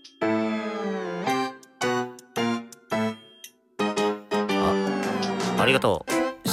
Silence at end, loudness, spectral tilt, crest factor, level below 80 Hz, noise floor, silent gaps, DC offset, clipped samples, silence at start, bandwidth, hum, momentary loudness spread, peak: 0 s; -26 LUFS; -4.5 dB/octave; 18 dB; -60 dBFS; -50 dBFS; none; under 0.1%; under 0.1%; 0.05 s; 16 kHz; none; 10 LU; -8 dBFS